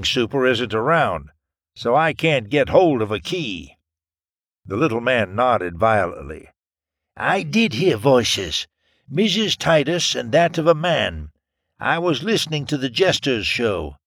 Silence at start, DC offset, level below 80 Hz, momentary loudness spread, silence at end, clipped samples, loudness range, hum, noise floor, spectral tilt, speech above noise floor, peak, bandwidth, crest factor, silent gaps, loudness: 0 s; under 0.1%; -46 dBFS; 10 LU; 0.1 s; under 0.1%; 3 LU; none; under -90 dBFS; -4.5 dB/octave; over 71 dB; -2 dBFS; 17 kHz; 20 dB; none; -19 LUFS